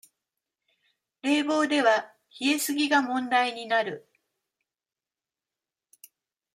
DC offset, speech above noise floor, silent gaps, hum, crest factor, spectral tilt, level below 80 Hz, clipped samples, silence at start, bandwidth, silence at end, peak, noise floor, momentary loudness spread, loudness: under 0.1%; over 65 dB; none; none; 20 dB; -2 dB/octave; -84 dBFS; under 0.1%; 1.25 s; 16 kHz; 2.55 s; -10 dBFS; under -90 dBFS; 11 LU; -25 LUFS